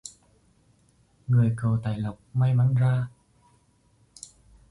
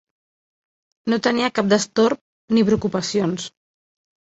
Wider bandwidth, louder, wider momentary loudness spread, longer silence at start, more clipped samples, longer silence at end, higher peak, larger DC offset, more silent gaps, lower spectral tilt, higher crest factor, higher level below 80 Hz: first, 11.5 kHz vs 8.2 kHz; second, -25 LUFS vs -20 LUFS; first, 23 LU vs 12 LU; second, 0.05 s vs 1.05 s; neither; first, 1.65 s vs 0.75 s; second, -12 dBFS vs -4 dBFS; neither; second, none vs 2.21-2.48 s; first, -8 dB/octave vs -5 dB/octave; about the same, 14 dB vs 18 dB; about the same, -56 dBFS vs -56 dBFS